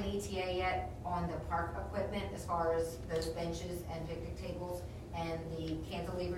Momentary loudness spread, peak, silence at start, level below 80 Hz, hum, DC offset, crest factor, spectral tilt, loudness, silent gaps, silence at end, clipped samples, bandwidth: 7 LU; -24 dBFS; 0 s; -48 dBFS; none; under 0.1%; 14 dB; -5.5 dB/octave; -39 LUFS; none; 0 s; under 0.1%; 16 kHz